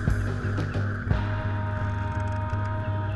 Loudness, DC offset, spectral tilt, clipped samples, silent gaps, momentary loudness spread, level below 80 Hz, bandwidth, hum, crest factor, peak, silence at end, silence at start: -29 LUFS; under 0.1%; -8 dB/octave; under 0.1%; none; 2 LU; -36 dBFS; 7.8 kHz; none; 16 dB; -10 dBFS; 0 s; 0 s